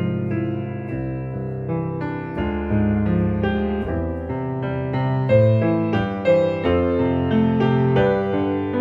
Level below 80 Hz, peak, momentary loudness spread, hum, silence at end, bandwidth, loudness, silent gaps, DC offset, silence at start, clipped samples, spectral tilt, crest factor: -38 dBFS; -4 dBFS; 9 LU; none; 0 s; 5.2 kHz; -21 LUFS; none; under 0.1%; 0 s; under 0.1%; -10 dB/octave; 16 dB